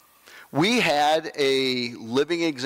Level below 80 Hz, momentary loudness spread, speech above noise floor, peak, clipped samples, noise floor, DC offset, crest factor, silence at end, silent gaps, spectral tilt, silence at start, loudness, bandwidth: -64 dBFS; 7 LU; 27 dB; -12 dBFS; under 0.1%; -49 dBFS; under 0.1%; 12 dB; 0 s; none; -4 dB/octave; 0.25 s; -23 LUFS; 16 kHz